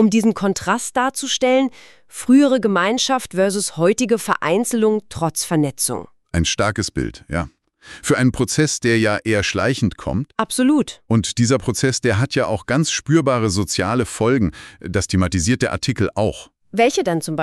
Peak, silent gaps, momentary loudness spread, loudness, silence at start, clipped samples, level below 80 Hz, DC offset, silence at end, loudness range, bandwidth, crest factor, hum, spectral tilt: -4 dBFS; none; 8 LU; -19 LUFS; 0 s; under 0.1%; -42 dBFS; under 0.1%; 0 s; 3 LU; 13.5 kHz; 16 dB; none; -4.5 dB/octave